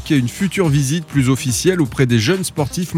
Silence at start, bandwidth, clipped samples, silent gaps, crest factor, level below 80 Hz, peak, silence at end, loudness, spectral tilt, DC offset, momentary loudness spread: 0 s; 16.5 kHz; under 0.1%; none; 14 dB; -40 dBFS; -2 dBFS; 0 s; -17 LUFS; -5.5 dB/octave; under 0.1%; 4 LU